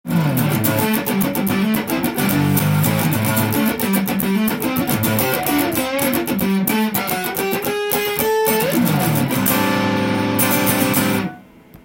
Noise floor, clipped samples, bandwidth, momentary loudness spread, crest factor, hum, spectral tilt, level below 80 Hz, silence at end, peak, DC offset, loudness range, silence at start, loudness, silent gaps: -42 dBFS; under 0.1%; 17 kHz; 4 LU; 18 dB; none; -5 dB/octave; -48 dBFS; 0.1 s; 0 dBFS; under 0.1%; 2 LU; 0.05 s; -18 LUFS; none